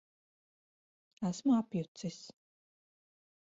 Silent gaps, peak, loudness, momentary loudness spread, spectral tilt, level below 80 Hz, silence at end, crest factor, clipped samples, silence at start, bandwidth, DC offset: 1.88-1.95 s; -20 dBFS; -35 LUFS; 18 LU; -7.5 dB/octave; -76 dBFS; 1.1 s; 18 dB; under 0.1%; 1.2 s; 7.6 kHz; under 0.1%